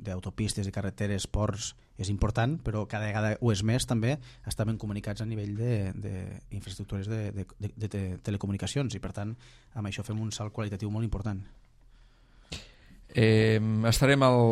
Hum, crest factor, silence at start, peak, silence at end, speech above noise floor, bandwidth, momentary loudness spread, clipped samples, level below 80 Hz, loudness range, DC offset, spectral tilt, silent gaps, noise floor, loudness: none; 22 dB; 0 s; -8 dBFS; 0 s; 28 dB; 14.5 kHz; 15 LU; under 0.1%; -44 dBFS; 7 LU; under 0.1%; -6 dB/octave; none; -57 dBFS; -30 LUFS